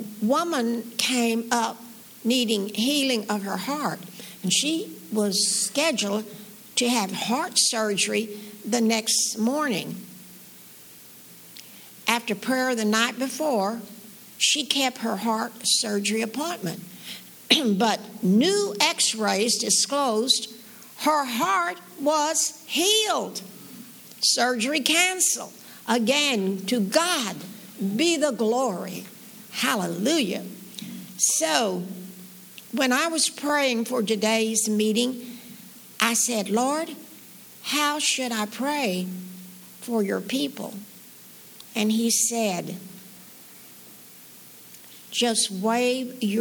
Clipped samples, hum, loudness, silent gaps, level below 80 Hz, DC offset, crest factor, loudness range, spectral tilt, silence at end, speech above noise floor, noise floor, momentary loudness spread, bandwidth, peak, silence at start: under 0.1%; none; -23 LUFS; none; -76 dBFS; under 0.1%; 24 dB; 5 LU; -2.5 dB/octave; 0 s; 23 dB; -47 dBFS; 22 LU; over 20 kHz; -2 dBFS; 0 s